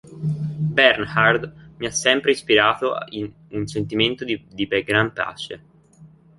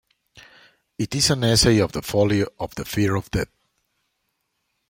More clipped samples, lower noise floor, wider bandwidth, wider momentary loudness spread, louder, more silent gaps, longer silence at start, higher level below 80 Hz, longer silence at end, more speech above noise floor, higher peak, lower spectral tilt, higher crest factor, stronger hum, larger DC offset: neither; second, -49 dBFS vs -74 dBFS; second, 11.5 kHz vs 16.5 kHz; first, 15 LU vs 12 LU; about the same, -20 LUFS vs -21 LUFS; neither; second, 0.05 s vs 0.35 s; second, -54 dBFS vs -44 dBFS; second, 0.3 s vs 1.45 s; second, 28 dB vs 54 dB; about the same, -2 dBFS vs -4 dBFS; about the same, -4 dB/octave vs -4.5 dB/octave; about the same, 20 dB vs 20 dB; neither; neither